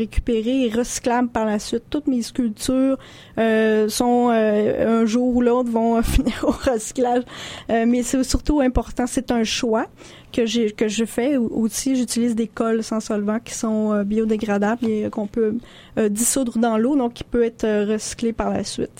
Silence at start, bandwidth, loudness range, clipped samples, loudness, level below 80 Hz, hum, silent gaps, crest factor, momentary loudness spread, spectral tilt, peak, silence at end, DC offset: 0 s; 16.5 kHz; 3 LU; under 0.1%; -21 LUFS; -36 dBFS; none; none; 16 dB; 6 LU; -4.5 dB/octave; -4 dBFS; 0.1 s; under 0.1%